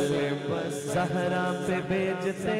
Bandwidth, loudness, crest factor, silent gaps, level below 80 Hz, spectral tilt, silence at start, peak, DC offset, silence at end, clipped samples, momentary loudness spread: 15.5 kHz; -29 LUFS; 10 dB; none; -60 dBFS; -5.5 dB/octave; 0 s; -18 dBFS; under 0.1%; 0 s; under 0.1%; 3 LU